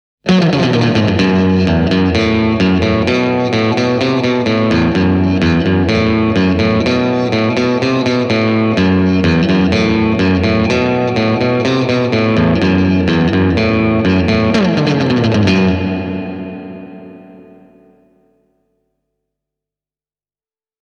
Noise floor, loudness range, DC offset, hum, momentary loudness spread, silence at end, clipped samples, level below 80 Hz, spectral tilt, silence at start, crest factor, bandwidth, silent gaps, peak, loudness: under -90 dBFS; 4 LU; under 0.1%; 50 Hz at -50 dBFS; 2 LU; 3.4 s; under 0.1%; -34 dBFS; -7 dB/octave; 0.25 s; 12 dB; 8.2 kHz; none; 0 dBFS; -13 LUFS